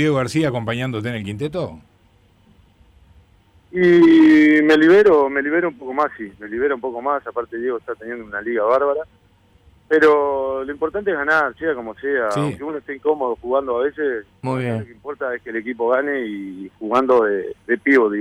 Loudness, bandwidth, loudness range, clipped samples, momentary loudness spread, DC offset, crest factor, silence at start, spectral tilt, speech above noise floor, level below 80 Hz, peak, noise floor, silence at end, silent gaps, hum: -18 LUFS; 11 kHz; 9 LU; under 0.1%; 16 LU; under 0.1%; 12 dB; 0 s; -7 dB/octave; 37 dB; -54 dBFS; -6 dBFS; -55 dBFS; 0 s; none; none